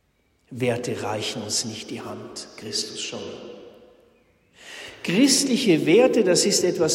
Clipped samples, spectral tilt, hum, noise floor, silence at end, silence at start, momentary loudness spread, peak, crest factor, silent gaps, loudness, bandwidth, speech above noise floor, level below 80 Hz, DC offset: under 0.1%; -3.5 dB/octave; none; -65 dBFS; 0 s; 0.5 s; 20 LU; -6 dBFS; 18 dB; none; -21 LUFS; 16 kHz; 43 dB; -66 dBFS; under 0.1%